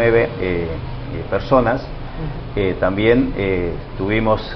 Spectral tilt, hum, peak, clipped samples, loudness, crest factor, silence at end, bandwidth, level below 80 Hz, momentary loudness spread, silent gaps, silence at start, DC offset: -9 dB/octave; none; 0 dBFS; under 0.1%; -19 LUFS; 18 dB; 0 s; 6 kHz; -30 dBFS; 13 LU; none; 0 s; under 0.1%